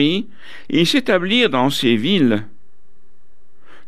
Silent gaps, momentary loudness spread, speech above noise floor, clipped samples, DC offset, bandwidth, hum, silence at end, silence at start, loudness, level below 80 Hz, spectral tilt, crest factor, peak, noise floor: none; 9 LU; 44 dB; under 0.1%; 4%; 14.5 kHz; none; 1.45 s; 0 s; -16 LUFS; -58 dBFS; -5 dB/octave; 16 dB; -2 dBFS; -61 dBFS